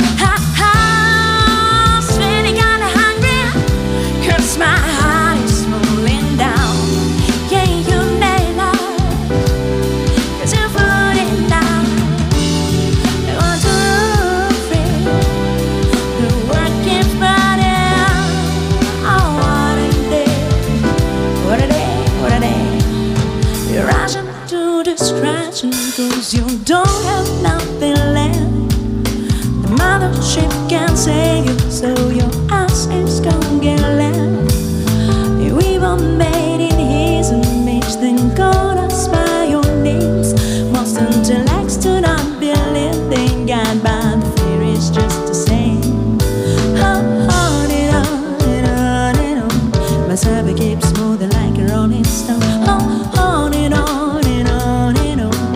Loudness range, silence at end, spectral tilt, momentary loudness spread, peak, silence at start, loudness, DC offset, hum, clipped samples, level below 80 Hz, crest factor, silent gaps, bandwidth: 2 LU; 0 s; -5 dB/octave; 4 LU; 0 dBFS; 0 s; -14 LUFS; under 0.1%; none; under 0.1%; -22 dBFS; 12 dB; none; 16.5 kHz